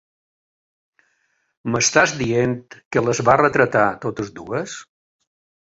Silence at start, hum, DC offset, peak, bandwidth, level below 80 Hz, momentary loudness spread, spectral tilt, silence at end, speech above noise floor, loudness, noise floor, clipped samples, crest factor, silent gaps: 1.65 s; none; under 0.1%; -2 dBFS; 8.2 kHz; -54 dBFS; 15 LU; -4 dB/octave; 0.95 s; 49 dB; -19 LUFS; -68 dBFS; under 0.1%; 20 dB; 2.85-2.91 s